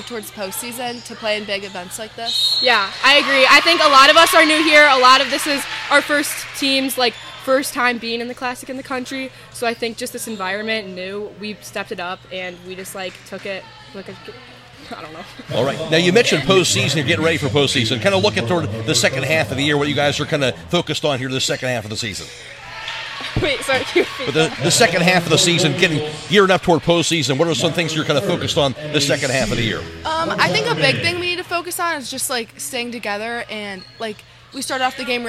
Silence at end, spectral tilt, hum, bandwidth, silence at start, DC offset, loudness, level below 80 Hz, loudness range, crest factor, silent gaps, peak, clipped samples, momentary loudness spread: 0 s; -3.5 dB/octave; none; 16 kHz; 0 s; under 0.1%; -16 LUFS; -48 dBFS; 14 LU; 18 dB; none; 0 dBFS; under 0.1%; 18 LU